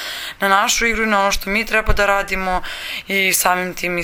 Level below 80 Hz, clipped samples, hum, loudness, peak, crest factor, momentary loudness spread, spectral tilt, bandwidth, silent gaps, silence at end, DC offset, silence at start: -30 dBFS; under 0.1%; none; -17 LUFS; 0 dBFS; 18 dB; 8 LU; -2.5 dB/octave; 19.5 kHz; none; 0 s; under 0.1%; 0 s